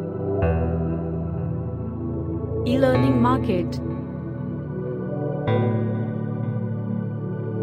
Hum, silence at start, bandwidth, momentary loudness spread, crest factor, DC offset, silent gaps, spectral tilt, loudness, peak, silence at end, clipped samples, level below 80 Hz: none; 0 s; 10 kHz; 10 LU; 18 dB; under 0.1%; none; -9.5 dB/octave; -24 LUFS; -6 dBFS; 0 s; under 0.1%; -40 dBFS